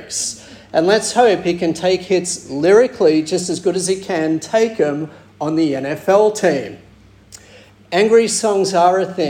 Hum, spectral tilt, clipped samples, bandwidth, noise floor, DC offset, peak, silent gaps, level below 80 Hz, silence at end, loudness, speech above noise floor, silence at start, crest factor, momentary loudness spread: none; -4 dB/octave; under 0.1%; 16 kHz; -44 dBFS; under 0.1%; -2 dBFS; none; -56 dBFS; 0 s; -16 LUFS; 29 dB; 0 s; 14 dB; 9 LU